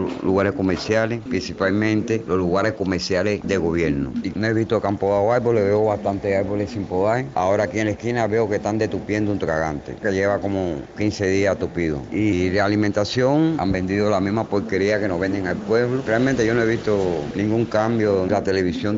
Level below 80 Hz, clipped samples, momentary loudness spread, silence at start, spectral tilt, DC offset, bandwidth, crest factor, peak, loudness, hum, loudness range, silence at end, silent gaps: -46 dBFS; under 0.1%; 5 LU; 0 s; -6.5 dB/octave; under 0.1%; 7.8 kHz; 14 dB; -6 dBFS; -21 LUFS; none; 2 LU; 0 s; none